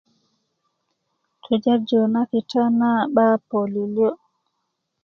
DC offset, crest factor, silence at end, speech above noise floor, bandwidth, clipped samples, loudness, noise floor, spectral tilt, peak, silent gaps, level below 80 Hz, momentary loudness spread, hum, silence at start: under 0.1%; 18 dB; 0.9 s; 57 dB; 6.4 kHz; under 0.1%; -20 LUFS; -76 dBFS; -7.5 dB/octave; -4 dBFS; none; -70 dBFS; 6 LU; none; 1.5 s